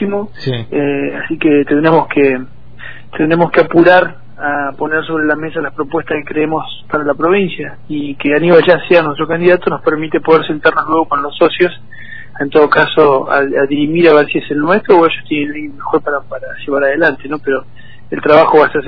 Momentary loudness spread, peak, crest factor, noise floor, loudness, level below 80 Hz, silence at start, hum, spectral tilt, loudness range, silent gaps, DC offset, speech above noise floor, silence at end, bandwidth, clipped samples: 13 LU; 0 dBFS; 12 dB; -33 dBFS; -12 LUFS; -48 dBFS; 0 s; none; -8.5 dB/octave; 5 LU; none; 3%; 21 dB; 0 s; 5.4 kHz; 0.4%